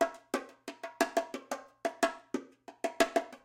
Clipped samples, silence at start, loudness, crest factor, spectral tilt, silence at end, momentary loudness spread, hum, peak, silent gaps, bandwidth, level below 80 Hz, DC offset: under 0.1%; 0 s; -35 LUFS; 24 dB; -2 dB/octave; 0.1 s; 15 LU; none; -12 dBFS; none; 16.5 kHz; -70 dBFS; under 0.1%